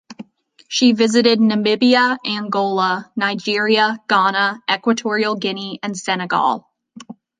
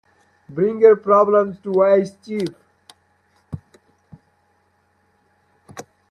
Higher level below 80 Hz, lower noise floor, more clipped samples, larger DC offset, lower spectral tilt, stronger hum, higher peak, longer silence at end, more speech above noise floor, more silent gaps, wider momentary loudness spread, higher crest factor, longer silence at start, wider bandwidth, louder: second, -70 dBFS vs -62 dBFS; second, -40 dBFS vs -63 dBFS; neither; neither; second, -4 dB/octave vs -7.5 dB/octave; neither; about the same, -2 dBFS vs -2 dBFS; about the same, 0.25 s vs 0.3 s; second, 23 dB vs 47 dB; neither; second, 9 LU vs 26 LU; about the same, 16 dB vs 20 dB; second, 0.1 s vs 0.5 s; second, 9.6 kHz vs 11 kHz; about the same, -17 LUFS vs -17 LUFS